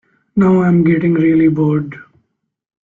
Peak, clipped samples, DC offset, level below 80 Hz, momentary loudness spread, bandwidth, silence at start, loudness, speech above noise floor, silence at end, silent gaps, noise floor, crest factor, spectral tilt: -2 dBFS; under 0.1%; under 0.1%; -50 dBFS; 9 LU; 3.8 kHz; 0.35 s; -13 LUFS; 54 dB; 0.85 s; none; -66 dBFS; 12 dB; -10.5 dB/octave